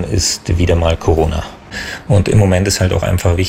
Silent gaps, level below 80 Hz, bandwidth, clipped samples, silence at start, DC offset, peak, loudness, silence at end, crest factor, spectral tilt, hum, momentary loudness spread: none; -28 dBFS; 16 kHz; under 0.1%; 0 s; under 0.1%; -2 dBFS; -14 LUFS; 0 s; 12 dB; -5 dB/octave; none; 12 LU